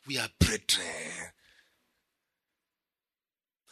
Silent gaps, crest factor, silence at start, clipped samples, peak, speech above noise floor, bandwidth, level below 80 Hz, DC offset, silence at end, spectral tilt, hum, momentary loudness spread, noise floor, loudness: none; 26 dB; 0.05 s; under 0.1%; -10 dBFS; over 59 dB; 13.5 kHz; -46 dBFS; under 0.1%; 2.4 s; -3 dB/octave; none; 15 LU; under -90 dBFS; -29 LUFS